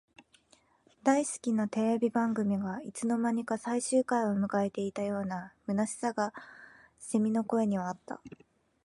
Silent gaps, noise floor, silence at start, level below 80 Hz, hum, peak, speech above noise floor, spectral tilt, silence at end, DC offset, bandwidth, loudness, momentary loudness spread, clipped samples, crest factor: none; -66 dBFS; 1.05 s; -72 dBFS; none; -14 dBFS; 36 dB; -6 dB/octave; 0.5 s; under 0.1%; 11.5 kHz; -31 LUFS; 10 LU; under 0.1%; 18 dB